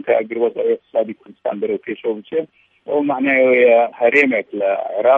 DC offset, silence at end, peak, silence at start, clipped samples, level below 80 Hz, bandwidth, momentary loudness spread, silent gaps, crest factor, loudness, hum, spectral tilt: under 0.1%; 0 s; 0 dBFS; 0.05 s; under 0.1%; -74 dBFS; 7.4 kHz; 12 LU; none; 16 dB; -17 LUFS; none; -6.5 dB/octave